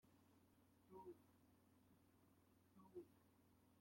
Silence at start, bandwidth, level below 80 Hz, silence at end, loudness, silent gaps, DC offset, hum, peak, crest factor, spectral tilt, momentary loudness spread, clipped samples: 0 s; 16.5 kHz; under -90 dBFS; 0 s; -64 LUFS; none; under 0.1%; none; -48 dBFS; 20 dB; -6.5 dB/octave; 5 LU; under 0.1%